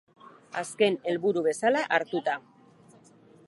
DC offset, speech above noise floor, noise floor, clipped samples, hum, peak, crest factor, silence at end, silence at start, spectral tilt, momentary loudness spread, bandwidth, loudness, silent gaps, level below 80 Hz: under 0.1%; 30 dB; -56 dBFS; under 0.1%; none; -8 dBFS; 20 dB; 1.1 s; 0.25 s; -4 dB/octave; 11 LU; 11.5 kHz; -27 LUFS; none; -82 dBFS